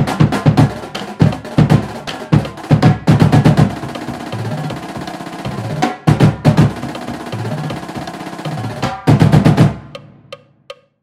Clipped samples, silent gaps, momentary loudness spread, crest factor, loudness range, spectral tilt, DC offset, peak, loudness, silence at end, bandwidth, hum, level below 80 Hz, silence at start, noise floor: 0.4%; none; 15 LU; 14 dB; 3 LU; -7.5 dB/octave; under 0.1%; 0 dBFS; -15 LUFS; 0.3 s; 13 kHz; none; -34 dBFS; 0 s; -39 dBFS